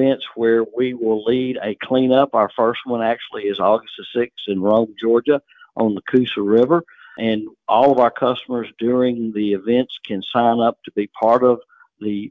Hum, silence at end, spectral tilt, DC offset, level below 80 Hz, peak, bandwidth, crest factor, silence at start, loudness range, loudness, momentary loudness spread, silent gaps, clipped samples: none; 0 s; -8.5 dB/octave; under 0.1%; -60 dBFS; -2 dBFS; 4.9 kHz; 16 dB; 0 s; 2 LU; -19 LUFS; 10 LU; none; under 0.1%